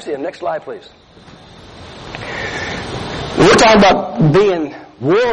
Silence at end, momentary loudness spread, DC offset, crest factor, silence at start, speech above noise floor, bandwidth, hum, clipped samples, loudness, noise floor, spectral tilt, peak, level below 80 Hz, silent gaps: 0 s; 22 LU; under 0.1%; 14 dB; 0 s; 27 dB; 11.5 kHz; none; under 0.1%; -13 LUFS; -40 dBFS; -5 dB/octave; -2 dBFS; -38 dBFS; none